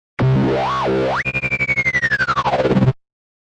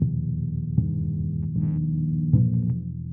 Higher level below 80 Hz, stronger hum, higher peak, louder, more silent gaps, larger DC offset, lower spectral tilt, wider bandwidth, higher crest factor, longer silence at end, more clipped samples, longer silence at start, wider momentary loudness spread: about the same, -40 dBFS vs -42 dBFS; second, none vs 60 Hz at -40 dBFS; about the same, -6 dBFS vs -8 dBFS; first, -17 LUFS vs -25 LUFS; neither; neither; second, -7 dB/octave vs -15.5 dB/octave; first, 8.4 kHz vs 1.1 kHz; about the same, 12 dB vs 16 dB; first, 0.45 s vs 0 s; neither; first, 0.2 s vs 0 s; second, 3 LU vs 7 LU